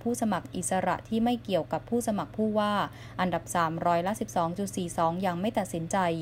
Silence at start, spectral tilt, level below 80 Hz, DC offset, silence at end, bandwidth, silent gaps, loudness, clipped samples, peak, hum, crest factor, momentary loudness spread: 0 s; -5 dB/octave; -56 dBFS; under 0.1%; 0 s; 16 kHz; none; -29 LUFS; under 0.1%; -14 dBFS; none; 16 dB; 4 LU